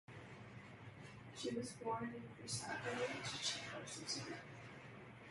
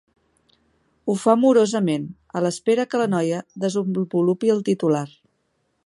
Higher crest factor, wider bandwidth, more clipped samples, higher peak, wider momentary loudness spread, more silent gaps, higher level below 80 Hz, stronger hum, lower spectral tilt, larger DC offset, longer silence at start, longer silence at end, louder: about the same, 22 dB vs 20 dB; about the same, 11.5 kHz vs 11.5 kHz; neither; second, -26 dBFS vs -2 dBFS; first, 14 LU vs 9 LU; neither; second, -74 dBFS vs -68 dBFS; neither; second, -3 dB/octave vs -6.5 dB/octave; neither; second, 0.1 s vs 1.05 s; second, 0 s vs 0.8 s; second, -46 LUFS vs -21 LUFS